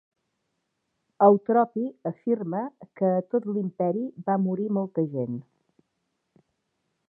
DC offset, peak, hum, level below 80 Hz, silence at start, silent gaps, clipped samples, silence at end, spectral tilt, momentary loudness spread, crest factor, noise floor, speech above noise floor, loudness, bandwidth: under 0.1%; -4 dBFS; none; -82 dBFS; 1.2 s; none; under 0.1%; 1.65 s; -13 dB/octave; 12 LU; 22 dB; -78 dBFS; 53 dB; -26 LUFS; 3.2 kHz